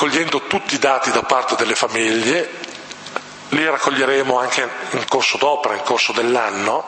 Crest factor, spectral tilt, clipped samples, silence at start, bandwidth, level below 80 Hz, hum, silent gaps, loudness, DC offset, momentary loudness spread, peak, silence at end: 18 dB; -2.5 dB/octave; under 0.1%; 0 s; 8.8 kHz; -64 dBFS; none; none; -17 LUFS; under 0.1%; 12 LU; 0 dBFS; 0 s